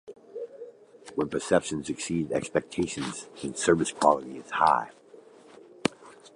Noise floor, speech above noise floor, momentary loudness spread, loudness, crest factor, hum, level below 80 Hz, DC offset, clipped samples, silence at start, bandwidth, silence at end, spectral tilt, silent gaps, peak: -52 dBFS; 25 dB; 18 LU; -28 LUFS; 24 dB; none; -60 dBFS; under 0.1%; under 0.1%; 0.05 s; 11.5 kHz; 0.1 s; -4.5 dB/octave; none; -4 dBFS